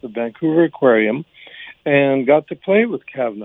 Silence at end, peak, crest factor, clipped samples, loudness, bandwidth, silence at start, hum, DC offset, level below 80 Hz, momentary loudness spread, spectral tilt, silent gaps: 0 s; -2 dBFS; 16 dB; under 0.1%; -17 LUFS; 3.9 kHz; 0.05 s; none; under 0.1%; -70 dBFS; 13 LU; -9.5 dB/octave; none